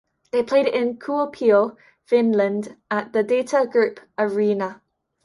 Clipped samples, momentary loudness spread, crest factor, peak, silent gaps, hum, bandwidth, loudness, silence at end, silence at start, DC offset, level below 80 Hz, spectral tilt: under 0.1%; 8 LU; 16 dB; -6 dBFS; none; none; 11.5 kHz; -21 LUFS; 0.5 s; 0.35 s; under 0.1%; -68 dBFS; -6 dB/octave